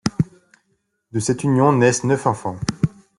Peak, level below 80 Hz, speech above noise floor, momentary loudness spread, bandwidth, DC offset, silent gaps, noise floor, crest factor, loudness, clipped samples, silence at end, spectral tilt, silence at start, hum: -2 dBFS; -48 dBFS; 51 dB; 10 LU; 11.5 kHz; under 0.1%; none; -69 dBFS; 18 dB; -20 LUFS; under 0.1%; 0.3 s; -6 dB/octave; 0.05 s; none